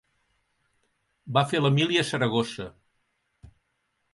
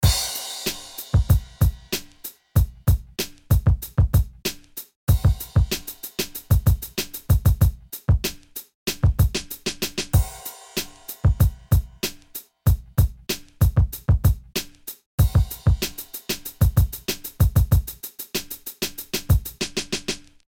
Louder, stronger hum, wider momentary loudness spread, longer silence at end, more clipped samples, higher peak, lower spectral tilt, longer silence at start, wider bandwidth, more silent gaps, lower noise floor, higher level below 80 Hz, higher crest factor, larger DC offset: about the same, -25 LUFS vs -23 LUFS; neither; first, 13 LU vs 10 LU; first, 0.7 s vs 0.3 s; neither; about the same, -6 dBFS vs -6 dBFS; about the same, -5.5 dB/octave vs -5 dB/octave; first, 1.25 s vs 0 s; second, 11.5 kHz vs 17.5 kHz; second, none vs 4.96-5.07 s, 8.75-8.86 s, 15.06-15.18 s; first, -75 dBFS vs -42 dBFS; second, -62 dBFS vs -26 dBFS; first, 22 dB vs 16 dB; neither